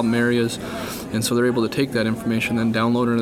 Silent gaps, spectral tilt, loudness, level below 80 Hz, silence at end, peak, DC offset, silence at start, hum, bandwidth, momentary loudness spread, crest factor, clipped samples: none; -5.5 dB/octave; -21 LUFS; -50 dBFS; 0 s; -8 dBFS; under 0.1%; 0 s; none; 16.5 kHz; 8 LU; 14 dB; under 0.1%